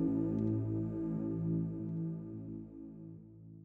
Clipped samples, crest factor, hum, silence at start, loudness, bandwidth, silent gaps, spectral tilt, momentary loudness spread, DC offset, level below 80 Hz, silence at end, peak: under 0.1%; 14 dB; none; 0 s; -38 LUFS; 2.6 kHz; none; -13 dB/octave; 17 LU; under 0.1%; -60 dBFS; 0 s; -22 dBFS